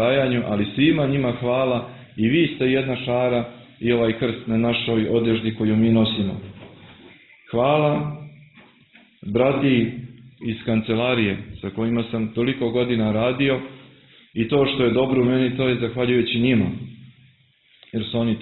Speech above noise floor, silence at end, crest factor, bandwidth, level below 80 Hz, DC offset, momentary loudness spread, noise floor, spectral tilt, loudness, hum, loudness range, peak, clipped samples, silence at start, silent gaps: 38 dB; 0 s; 16 dB; 4.2 kHz; -50 dBFS; under 0.1%; 12 LU; -58 dBFS; -11 dB/octave; -21 LUFS; none; 3 LU; -4 dBFS; under 0.1%; 0 s; none